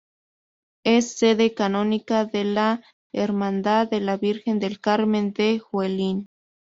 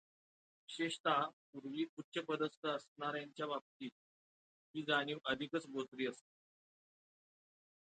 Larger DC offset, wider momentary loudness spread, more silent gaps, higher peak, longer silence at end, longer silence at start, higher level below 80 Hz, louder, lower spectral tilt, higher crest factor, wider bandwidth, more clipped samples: neither; second, 6 LU vs 15 LU; second, 2.93-3.10 s vs 1.00-1.04 s, 1.33-1.53 s, 1.89-1.97 s, 2.04-2.12 s, 2.57-2.63 s, 2.88-2.96 s, 3.61-3.80 s, 3.92-4.74 s; first, -6 dBFS vs -22 dBFS; second, 0.45 s vs 1.65 s; first, 0.85 s vs 0.7 s; first, -64 dBFS vs -84 dBFS; first, -23 LUFS vs -41 LUFS; about the same, -4.5 dB/octave vs -4.5 dB/octave; second, 16 dB vs 22 dB; second, 7.8 kHz vs 9 kHz; neither